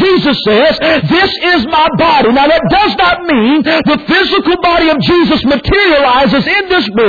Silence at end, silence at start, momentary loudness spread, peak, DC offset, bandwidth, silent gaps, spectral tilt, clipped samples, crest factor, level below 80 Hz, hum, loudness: 0 s; 0 s; 3 LU; 0 dBFS; under 0.1%; 5 kHz; none; -6.5 dB/octave; under 0.1%; 8 dB; -32 dBFS; none; -9 LUFS